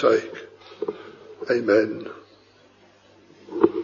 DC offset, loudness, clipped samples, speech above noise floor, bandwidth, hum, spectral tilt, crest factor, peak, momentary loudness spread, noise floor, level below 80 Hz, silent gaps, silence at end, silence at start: under 0.1%; -24 LUFS; under 0.1%; 34 dB; 7.2 kHz; 50 Hz at -60 dBFS; -6 dB/octave; 24 dB; -2 dBFS; 23 LU; -55 dBFS; -70 dBFS; none; 0 s; 0 s